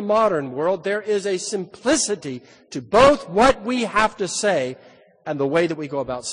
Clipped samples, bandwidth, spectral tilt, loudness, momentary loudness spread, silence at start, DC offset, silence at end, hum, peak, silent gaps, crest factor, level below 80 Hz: under 0.1%; 10 kHz; -3.5 dB/octave; -20 LUFS; 16 LU; 0 s; under 0.1%; 0 s; none; 0 dBFS; none; 20 dB; -46 dBFS